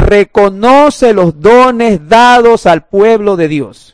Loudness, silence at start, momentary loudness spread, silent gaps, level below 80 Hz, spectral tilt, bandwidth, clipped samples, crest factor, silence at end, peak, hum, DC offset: -7 LUFS; 0 s; 7 LU; none; -26 dBFS; -5.5 dB/octave; 11 kHz; 10%; 6 dB; 0.25 s; 0 dBFS; none; under 0.1%